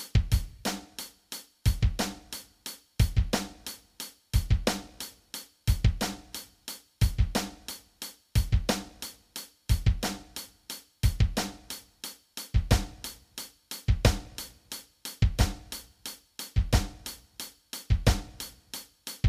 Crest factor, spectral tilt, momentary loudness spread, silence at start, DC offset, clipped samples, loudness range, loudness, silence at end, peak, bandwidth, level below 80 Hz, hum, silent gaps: 22 dB; -4.5 dB/octave; 15 LU; 0 s; under 0.1%; under 0.1%; 2 LU; -32 LUFS; 0 s; -8 dBFS; 15.5 kHz; -34 dBFS; none; none